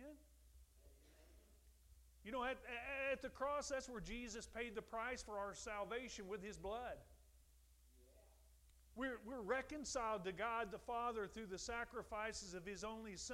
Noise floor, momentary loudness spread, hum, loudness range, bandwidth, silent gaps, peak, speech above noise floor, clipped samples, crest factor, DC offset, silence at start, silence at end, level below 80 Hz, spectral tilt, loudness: -70 dBFS; 7 LU; none; 6 LU; 16 kHz; none; -30 dBFS; 23 dB; under 0.1%; 20 dB; under 0.1%; 0 s; 0 s; -66 dBFS; -3 dB/octave; -47 LUFS